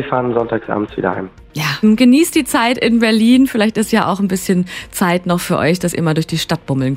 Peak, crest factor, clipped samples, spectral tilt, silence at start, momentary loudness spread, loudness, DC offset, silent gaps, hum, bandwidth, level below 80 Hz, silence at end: 0 dBFS; 14 dB; under 0.1%; -5 dB/octave; 0 s; 9 LU; -15 LUFS; under 0.1%; none; none; 16.5 kHz; -44 dBFS; 0 s